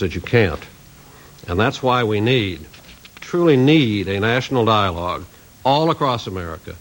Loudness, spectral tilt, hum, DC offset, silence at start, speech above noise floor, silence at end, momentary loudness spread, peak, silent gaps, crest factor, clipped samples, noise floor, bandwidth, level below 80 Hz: -18 LUFS; -6.5 dB/octave; none; under 0.1%; 0 s; 26 dB; 0 s; 15 LU; -2 dBFS; none; 18 dB; under 0.1%; -44 dBFS; 16.5 kHz; -44 dBFS